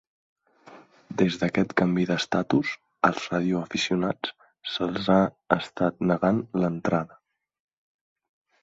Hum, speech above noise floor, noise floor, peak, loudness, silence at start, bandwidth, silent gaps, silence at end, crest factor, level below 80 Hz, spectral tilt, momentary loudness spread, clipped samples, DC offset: none; 27 dB; -51 dBFS; -2 dBFS; -25 LUFS; 0.7 s; 7.8 kHz; none; 1.55 s; 24 dB; -60 dBFS; -6 dB/octave; 9 LU; under 0.1%; under 0.1%